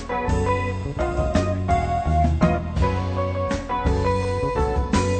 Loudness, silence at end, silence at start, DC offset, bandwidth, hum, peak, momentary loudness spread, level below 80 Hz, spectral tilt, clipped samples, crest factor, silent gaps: -23 LUFS; 0 s; 0 s; under 0.1%; 9 kHz; none; -4 dBFS; 4 LU; -28 dBFS; -7 dB/octave; under 0.1%; 18 dB; none